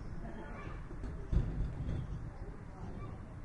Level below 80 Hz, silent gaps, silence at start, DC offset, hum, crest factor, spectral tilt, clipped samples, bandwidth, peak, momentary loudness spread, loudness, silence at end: -42 dBFS; none; 0 s; under 0.1%; none; 22 dB; -8.5 dB/octave; under 0.1%; 8.6 kHz; -18 dBFS; 10 LU; -43 LUFS; 0 s